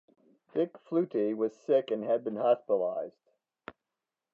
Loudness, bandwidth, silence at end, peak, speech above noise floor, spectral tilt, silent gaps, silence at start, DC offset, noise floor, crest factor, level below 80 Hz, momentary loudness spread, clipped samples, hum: -31 LUFS; 7.2 kHz; 1.25 s; -14 dBFS; 59 dB; -8 dB/octave; none; 0.55 s; under 0.1%; -89 dBFS; 18 dB; -84 dBFS; 21 LU; under 0.1%; none